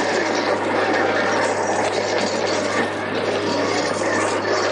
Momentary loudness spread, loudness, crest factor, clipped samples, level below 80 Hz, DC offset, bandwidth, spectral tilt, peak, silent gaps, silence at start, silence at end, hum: 3 LU; -20 LUFS; 14 dB; under 0.1%; -64 dBFS; under 0.1%; 11 kHz; -3.5 dB/octave; -8 dBFS; none; 0 s; 0 s; none